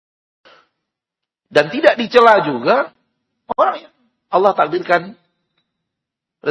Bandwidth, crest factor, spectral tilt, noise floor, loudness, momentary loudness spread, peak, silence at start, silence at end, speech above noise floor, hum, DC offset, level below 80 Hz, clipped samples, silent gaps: 11 kHz; 18 dB; -5.5 dB/octave; -84 dBFS; -15 LUFS; 15 LU; 0 dBFS; 1.55 s; 0 s; 69 dB; none; under 0.1%; -62 dBFS; 0.2%; none